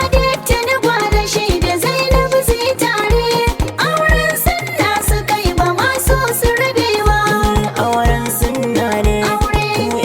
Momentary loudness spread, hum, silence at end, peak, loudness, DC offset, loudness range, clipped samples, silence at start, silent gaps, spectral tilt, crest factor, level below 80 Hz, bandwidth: 3 LU; none; 0 s; 0 dBFS; -15 LUFS; under 0.1%; 0 LU; under 0.1%; 0 s; none; -4 dB/octave; 14 dB; -22 dBFS; 19.5 kHz